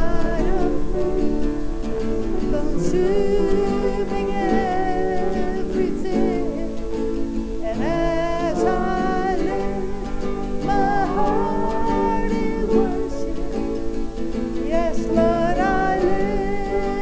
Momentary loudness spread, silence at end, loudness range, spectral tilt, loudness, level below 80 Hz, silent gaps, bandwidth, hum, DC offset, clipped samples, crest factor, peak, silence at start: 7 LU; 0 s; 2 LU; -7 dB/octave; -23 LUFS; -30 dBFS; none; 8 kHz; none; under 0.1%; under 0.1%; 14 dB; -4 dBFS; 0 s